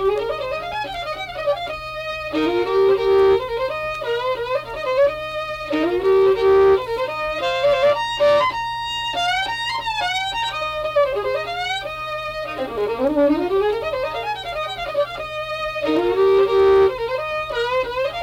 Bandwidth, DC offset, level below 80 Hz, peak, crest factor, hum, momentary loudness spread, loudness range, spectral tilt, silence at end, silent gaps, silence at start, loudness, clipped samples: 15 kHz; under 0.1%; -46 dBFS; -6 dBFS; 14 dB; none; 11 LU; 4 LU; -4.5 dB/octave; 0 s; none; 0 s; -20 LUFS; under 0.1%